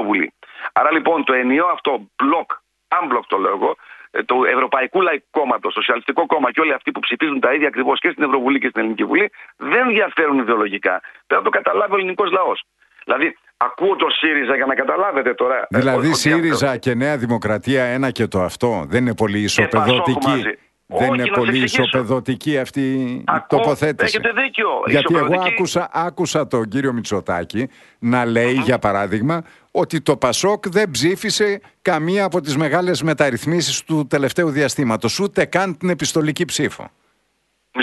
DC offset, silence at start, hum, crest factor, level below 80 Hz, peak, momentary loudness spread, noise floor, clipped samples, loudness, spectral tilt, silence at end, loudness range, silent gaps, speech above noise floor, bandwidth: under 0.1%; 0 s; none; 18 dB; -54 dBFS; 0 dBFS; 6 LU; -67 dBFS; under 0.1%; -18 LUFS; -4.5 dB/octave; 0 s; 2 LU; none; 49 dB; 12 kHz